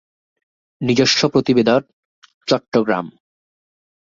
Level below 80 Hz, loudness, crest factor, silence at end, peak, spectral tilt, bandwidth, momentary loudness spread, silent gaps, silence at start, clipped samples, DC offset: -58 dBFS; -17 LUFS; 18 dB; 1.05 s; -2 dBFS; -4.5 dB/octave; 7.6 kHz; 11 LU; 1.93-2.22 s, 2.34-2.41 s, 2.68-2.72 s; 0.8 s; under 0.1%; under 0.1%